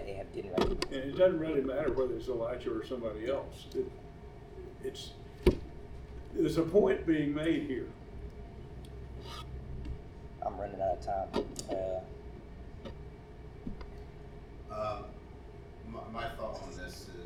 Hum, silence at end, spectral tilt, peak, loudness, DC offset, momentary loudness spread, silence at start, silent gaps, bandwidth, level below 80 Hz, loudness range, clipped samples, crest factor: none; 0 s; -6.5 dB/octave; -10 dBFS; -35 LUFS; under 0.1%; 20 LU; 0 s; none; 16 kHz; -46 dBFS; 12 LU; under 0.1%; 24 dB